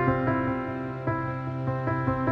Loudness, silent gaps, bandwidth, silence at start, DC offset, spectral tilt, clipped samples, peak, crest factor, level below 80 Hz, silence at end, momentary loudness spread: -29 LUFS; none; 5.2 kHz; 0 s; under 0.1%; -10 dB/octave; under 0.1%; -10 dBFS; 18 dB; -48 dBFS; 0 s; 6 LU